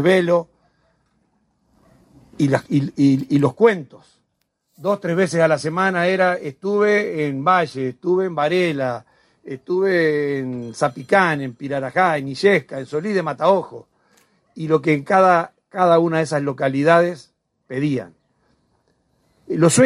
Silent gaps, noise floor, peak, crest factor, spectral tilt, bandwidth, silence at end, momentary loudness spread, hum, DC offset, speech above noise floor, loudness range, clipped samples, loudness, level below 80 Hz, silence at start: none; -71 dBFS; -2 dBFS; 18 dB; -5.5 dB/octave; 14 kHz; 0 s; 10 LU; none; under 0.1%; 53 dB; 3 LU; under 0.1%; -19 LUFS; -64 dBFS; 0 s